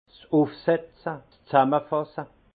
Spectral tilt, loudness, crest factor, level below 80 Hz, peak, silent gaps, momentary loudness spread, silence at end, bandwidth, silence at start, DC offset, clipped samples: -11 dB/octave; -25 LUFS; 22 dB; -66 dBFS; -4 dBFS; none; 14 LU; 0.3 s; 4.8 kHz; 0.3 s; under 0.1%; under 0.1%